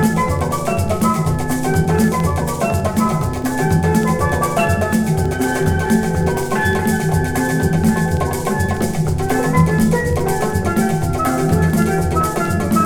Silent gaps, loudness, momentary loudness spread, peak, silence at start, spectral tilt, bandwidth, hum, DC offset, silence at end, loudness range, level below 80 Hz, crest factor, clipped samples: none; -17 LUFS; 4 LU; -2 dBFS; 0 s; -6 dB/octave; 19 kHz; none; under 0.1%; 0 s; 1 LU; -32 dBFS; 14 dB; under 0.1%